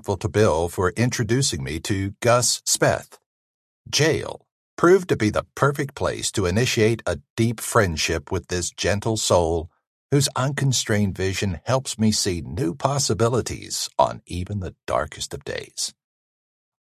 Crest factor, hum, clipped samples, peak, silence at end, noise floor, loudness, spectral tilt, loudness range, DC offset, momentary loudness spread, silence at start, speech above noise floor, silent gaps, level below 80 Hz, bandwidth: 20 dB; none; under 0.1%; -2 dBFS; 0.95 s; under -90 dBFS; -22 LUFS; -4.5 dB/octave; 3 LU; under 0.1%; 9 LU; 0.05 s; over 68 dB; 3.26-3.85 s, 4.52-4.77 s, 7.30-7.36 s, 9.87-10.09 s; -42 dBFS; 14.5 kHz